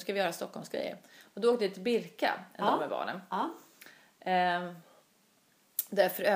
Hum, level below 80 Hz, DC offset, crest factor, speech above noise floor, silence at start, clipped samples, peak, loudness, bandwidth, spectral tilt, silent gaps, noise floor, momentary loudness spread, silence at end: none; -86 dBFS; under 0.1%; 20 dB; 36 dB; 0 s; under 0.1%; -12 dBFS; -32 LUFS; 15.5 kHz; -4 dB/octave; none; -68 dBFS; 14 LU; 0 s